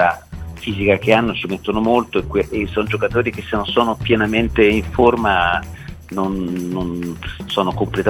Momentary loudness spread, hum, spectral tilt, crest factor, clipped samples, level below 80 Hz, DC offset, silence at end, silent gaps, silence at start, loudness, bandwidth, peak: 12 LU; none; -6.5 dB/octave; 18 dB; under 0.1%; -36 dBFS; under 0.1%; 0 s; none; 0 s; -18 LUFS; 18 kHz; 0 dBFS